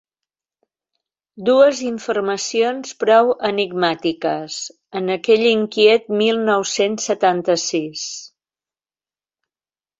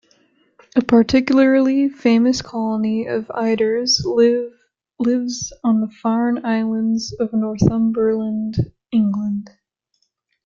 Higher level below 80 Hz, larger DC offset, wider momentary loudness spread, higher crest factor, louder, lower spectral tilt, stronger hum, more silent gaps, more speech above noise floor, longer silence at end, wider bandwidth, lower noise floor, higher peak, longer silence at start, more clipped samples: second, -66 dBFS vs -48 dBFS; neither; first, 12 LU vs 9 LU; about the same, 18 dB vs 16 dB; about the same, -18 LUFS vs -18 LUFS; second, -3.5 dB/octave vs -5.5 dB/octave; neither; neither; first, over 73 dB vs 52 dB; first, 1.7 s vs 0.95 s; about the same, 8 kHz vs 7.4 kHz; first, under -90 dBFS vs -69 dBFS; about the same, -2 dBFS vs -2 dBFS; first, 1.35 s vs 0.75 s; neither